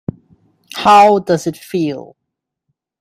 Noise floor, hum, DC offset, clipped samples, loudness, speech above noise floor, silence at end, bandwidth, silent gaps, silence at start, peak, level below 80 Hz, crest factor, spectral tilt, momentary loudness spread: -77 dBFS; none; under 0.1%; under 0.1%; -13 LUFS; 65 dB; 1 s; 15.5 kHz; none; 0.75 s; 0 dBFS; -56 dBFS; 16 dB; -5 dB/octave; 21 LU